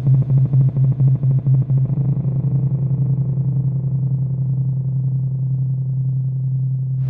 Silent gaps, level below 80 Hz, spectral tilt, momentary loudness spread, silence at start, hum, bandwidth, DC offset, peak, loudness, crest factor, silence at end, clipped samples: none; -44 dBFS; -14.5 dB/octave; 5 LU; 0 s; none; 1.2 kHz; under 0.1%; -6 dBFS; -19 LUFS; 10 dB; 0 s; under 0.1%